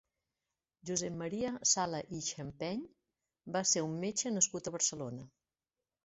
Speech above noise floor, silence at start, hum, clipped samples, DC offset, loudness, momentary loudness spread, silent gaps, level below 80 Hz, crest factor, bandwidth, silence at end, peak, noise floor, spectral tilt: over 54 dB; 0.85 s; none; under 0.1%; under 0.1%; -35 LUFS; 13 LU; none; -70 dBFS; 24 dB; 8.2 kHz; 0.75 s; -14 dBFS; under -90 dBFS; -2.5 dB/octave